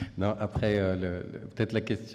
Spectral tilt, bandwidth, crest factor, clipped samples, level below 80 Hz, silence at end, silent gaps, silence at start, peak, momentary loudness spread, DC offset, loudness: -7.5 dB/octave; 10.5 kHz; 16 dB; under 0.1%; -52 dBFS; 0 s; none; 0 s; -14 dBFS; 8 LU; under 0.1%; -30 LUFS